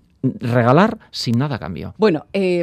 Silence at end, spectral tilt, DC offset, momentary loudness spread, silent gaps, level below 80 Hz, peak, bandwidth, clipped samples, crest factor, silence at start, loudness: 0 s; -7 dB/octave; under 0.1%; 11 LU; none; -52 dBFS; 0 dBFS; 13.5 kHz; under 0.1%; 18 dB; 0.25 s; -18 LUFS